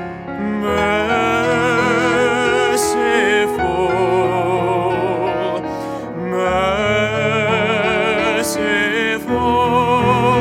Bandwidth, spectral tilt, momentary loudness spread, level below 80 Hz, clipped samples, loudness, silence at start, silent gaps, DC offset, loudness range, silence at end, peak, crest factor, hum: 16.5 kHz; -4.5 dB/octave; 6 LU; -42 dBFS; under 0.1%; -16 LUFS; 0 s; none; under 0.1%; 3 LU; 0 s; -2 dBFS; 14 dB; none